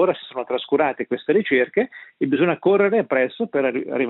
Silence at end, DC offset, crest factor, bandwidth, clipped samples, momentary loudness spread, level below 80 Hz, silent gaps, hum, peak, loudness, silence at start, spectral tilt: 0 s; under 0.1%; 16 dB; 4.1 kHz; under 0.1%; 9 LU; -68 dBFS; none; none; -6 dBFS; -21 LUFS; 0 s; -10.5 dB/octave